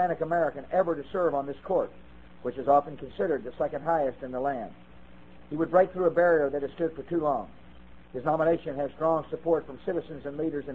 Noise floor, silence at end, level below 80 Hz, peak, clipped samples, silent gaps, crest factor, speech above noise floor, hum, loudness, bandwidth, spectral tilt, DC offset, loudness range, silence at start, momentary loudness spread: -51 dBFS; 0 s; -56 dBFS; -8 dBFS; under 0.1%; none; 20 dB; 24 dB; none; -28 LUFS; 4.2 kHz; -9 dB/octave; 0.3%; 2 LU; 0 s; 12 LU